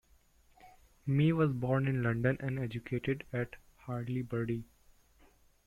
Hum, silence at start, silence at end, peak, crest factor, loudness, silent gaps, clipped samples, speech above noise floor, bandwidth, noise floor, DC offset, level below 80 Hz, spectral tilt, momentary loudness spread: none; 0.65 s; 1 s; -16 dBFS; 18 dB; -34 LUFS; none; under 0.1%; 33 dB; 10.5 kHz; -66 dBFS; under 0.1%; -60 dBFS; -9 dB/octave; 12 LU